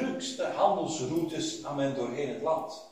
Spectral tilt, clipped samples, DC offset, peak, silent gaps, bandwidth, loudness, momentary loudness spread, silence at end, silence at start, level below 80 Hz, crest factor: -4.5 dB/octave; under 0.1%; under 0.1%; -12 dBFS; none; 16 kHz; -31 LUFS; 6 LU; 0.05 s; 0 s; -68 dBFS; 20 dB